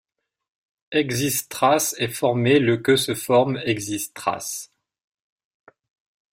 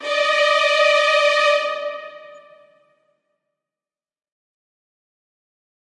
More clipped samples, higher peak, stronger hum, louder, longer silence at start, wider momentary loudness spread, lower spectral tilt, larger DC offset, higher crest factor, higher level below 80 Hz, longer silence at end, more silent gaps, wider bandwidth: neither; about the same, -4 dBFS vs -4 dBFS; neither; second, -21 LUFS vs -16 LUFS; first, 0.9 s vs 0 s; second, 9 LU vs 15 LU; first, -4 dB/octave vs 2 dB/octave; neither; about the same, 18 dB vs 18 dB; first, -60 dBFS vs -84 dBFS; second, 1.65 s vs 3.6 s; neither; first, 16.5 kHz vs 11 kHz